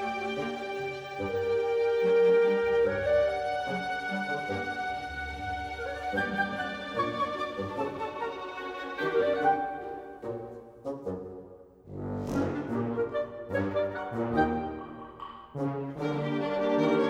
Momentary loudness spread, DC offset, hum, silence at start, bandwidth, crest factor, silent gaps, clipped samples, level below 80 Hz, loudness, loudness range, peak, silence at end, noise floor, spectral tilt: 14 LU; under 0.1%; none; 0 s; 10 kHz; 16 dB; none; under 0.1%; -54 dBFS; -30 LUFS; 7 LU; -14 dBFS; 0 s; -50 dBFS; -6.5 dB/octave